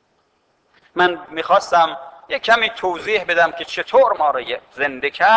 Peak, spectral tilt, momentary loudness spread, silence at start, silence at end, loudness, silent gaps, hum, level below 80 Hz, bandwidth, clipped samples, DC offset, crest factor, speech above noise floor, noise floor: -2 dBFS; -3 dB/octave; 11 LU; 0.95 s; 0 s; -18 LUFS; none; none; -58 dBFS; 8 kHz; under 0.1%; under 0.1%; 16 dB; 46 dB; -63 dBFS